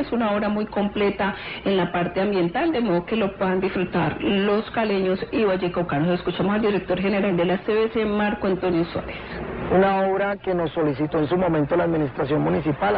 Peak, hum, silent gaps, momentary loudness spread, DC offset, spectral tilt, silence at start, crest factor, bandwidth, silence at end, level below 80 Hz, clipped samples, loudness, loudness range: -10 dBFS; none; none; 3 LU; 0.1%; -11.5 dB/octave; 0 s; 12 dB; 5.2 kHz; 0 s; -46 dBFS; under 0.1%; -23 LUFS; 1 LU